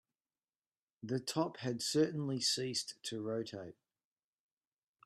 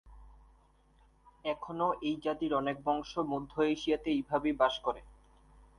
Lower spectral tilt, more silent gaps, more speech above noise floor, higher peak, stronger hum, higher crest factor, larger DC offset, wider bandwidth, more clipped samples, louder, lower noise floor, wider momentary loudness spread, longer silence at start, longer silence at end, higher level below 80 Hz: second, -4 dB/octave vs -5.5 dB/octave; neither; first, over 53 dB vs 32 dB; second, -20 dBFS vs -14 dBFS; neither; about the same, 20 dB vs 20 dB; neither; first, 13.5 kHz vs 10.5 kHz; neither; second, -37 LUFS vs -33 LUFS; first, under -90 dBFS vs -65 dBFS; first, 13 LU vs 8 LU; first, 1.05 s vs 0.05 s; first, 1.35 s vs 0.65 s; second, -82 dBFS vs -60 dBFS